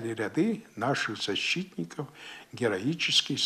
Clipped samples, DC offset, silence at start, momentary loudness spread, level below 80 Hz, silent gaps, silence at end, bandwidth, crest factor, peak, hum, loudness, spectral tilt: under 0.1%; under 0.1%; 0 s; 16 LU; -74 dBFS; none; 0 s; 14 kHz; 20 dB; -10 dBFS; none; -29 LUFS; -3.5 dB/octave